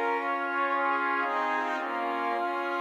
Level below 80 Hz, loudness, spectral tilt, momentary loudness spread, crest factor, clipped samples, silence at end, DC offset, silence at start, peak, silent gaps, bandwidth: -86 dBFS; -29 LUFS; -2.5 dB/octave; 4 LU; 12 dB; under 0.1%; 0 s; under 0.1%; 0 s; -16 dBFS; none; 15 kHz